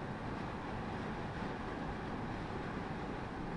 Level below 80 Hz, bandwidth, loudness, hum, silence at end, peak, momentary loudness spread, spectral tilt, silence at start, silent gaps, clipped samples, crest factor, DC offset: -52 dBFS; 11 kHz; -42 LUFS; none; 0 s; -28 dBFS; 1 LU; -7 dB/octave; 0 s; none; under 0.1%; 12 dB; under 0.1%